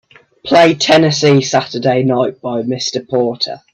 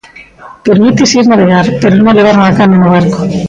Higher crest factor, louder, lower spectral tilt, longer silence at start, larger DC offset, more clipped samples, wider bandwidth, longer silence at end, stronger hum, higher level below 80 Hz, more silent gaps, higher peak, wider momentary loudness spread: first, 14 dB vs 6 dB; second, -13 LUFS vs -7 LUFS; about the same, -5 dB/octave vs -6 dB/octave; first, 0.45 s vs 0.15 s; neither; neither; first, 10.5 kHz vs 7.8 kHz; first, 0.15 s vs 0 s; neither; second, -56 dBFS vs -40 dBFS; neither; about the same, 0 dBFS vs 0 dBFS; first, 9 LU vs 4 LU